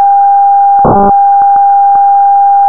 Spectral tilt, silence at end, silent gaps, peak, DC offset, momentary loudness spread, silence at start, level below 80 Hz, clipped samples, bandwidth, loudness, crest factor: -11 dB/octave; 0 s; none; -2 dBFS; 3%; 0 LU; 0 s; -34 dBFS; under 0.1%; 1.7 kHz; -6 LUFS; 4 dB